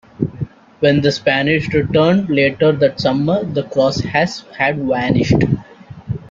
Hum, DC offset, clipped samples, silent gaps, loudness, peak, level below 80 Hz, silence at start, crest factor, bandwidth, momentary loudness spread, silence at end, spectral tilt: none; under 0.1%; under 0.1%; none; -16 LUFS; -2 dBFS; -42 dBFS; 0.2 s; 14 dB; 7.6 kHz; 10 LU; 0.05 s; -6.5 dB/octave